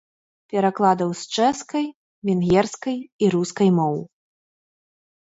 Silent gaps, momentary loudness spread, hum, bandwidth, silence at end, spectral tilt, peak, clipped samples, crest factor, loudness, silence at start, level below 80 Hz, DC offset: 1.94-2.22 s, 3.12-3.19 s; 10 LU; none; 8 kHz; 1.15 s; -6 dB/octave; -4 dBFS; under 0.1%; 18 dB; -22 LUFS; 0.55 s; -56 dBFS; under 0.1%